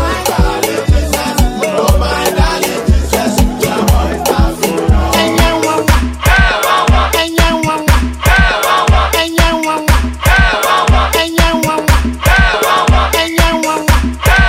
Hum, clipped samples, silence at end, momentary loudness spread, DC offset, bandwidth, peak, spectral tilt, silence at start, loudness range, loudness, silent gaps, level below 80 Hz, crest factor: none; under 0.1%; 0 s; 4 LU; under 0.1%; 16.5 kHz; 0 dBFS; -4.5 dB/octave; 0 s; 2 LU; -11 LUFS; none; -14 dBFS; 10 dB